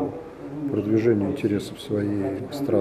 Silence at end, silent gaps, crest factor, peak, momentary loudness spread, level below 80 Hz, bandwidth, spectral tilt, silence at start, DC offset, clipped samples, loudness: 0 s; none; 16 dB; -8 dBFS; 11 LU; -58 dBFS; 14.5 kHz; -7.5 dB/octave; 0 s; under 0.1%; under 0.1%; -25 LUFS